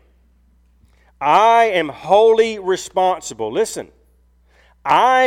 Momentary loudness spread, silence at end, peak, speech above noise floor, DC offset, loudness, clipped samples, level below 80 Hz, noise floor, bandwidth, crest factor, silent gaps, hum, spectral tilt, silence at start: 11 LU; 0 s; -2 dBFS; 40 dB; under 0.1%; -16 LUFS; under 0.1%; -54 dBFS; -55 dBFS; 15 kHz; 16 dB; none; none; -3 dB/octave; 1.2 s